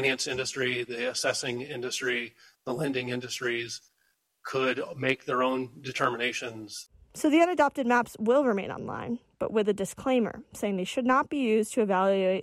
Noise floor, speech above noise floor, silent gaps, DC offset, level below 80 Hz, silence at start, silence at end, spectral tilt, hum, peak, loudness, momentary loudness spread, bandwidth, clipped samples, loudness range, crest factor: -73 dBFS; 45 dB; none; under 0.1%; -66 dBFS; 0 s; 0 s; -4 dB/octave; none; -12 dBFS; -28 LUFS; 12 LU; 15.5 kHz; under 0.1%; 5 LU; 16 dB